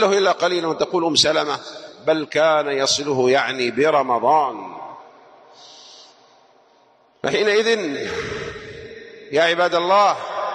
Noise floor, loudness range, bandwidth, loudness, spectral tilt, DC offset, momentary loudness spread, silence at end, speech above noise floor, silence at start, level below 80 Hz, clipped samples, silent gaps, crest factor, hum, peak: -56 dBFS; 6 LU; 11.5 kHz; -19 LUFS; -3 dB/octave; under 0.1%; 18 LU; 0 s; 37 dB; 0 s; -58 dBFS; under 0.1%; none; 16 dB; none; -4 dBFS